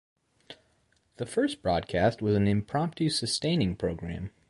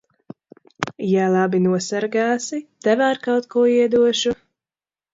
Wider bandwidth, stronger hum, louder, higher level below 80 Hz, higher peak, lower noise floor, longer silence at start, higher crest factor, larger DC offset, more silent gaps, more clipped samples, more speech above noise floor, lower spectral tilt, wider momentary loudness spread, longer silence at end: first, 11.5 kHz vs 7.8 kHz; neither; second, -28 LUFS vs -19 LUFS; first, -50 dBFS vs -62 dBFS; second, -12 dBFS vs 0 dBFS; second, -69 dBFS vs under -90 dBFS; second, 0.5 s vs 0.8 s; about the same, 18 dB vs 20 dB; neither; neither; neither; second, 41 dB vs over 72 dB; about the same, -5.5 dB/octave vs -5 dB/octave; second, 7 LU vs 10 LU; second, 0.2 s vs 0.8 s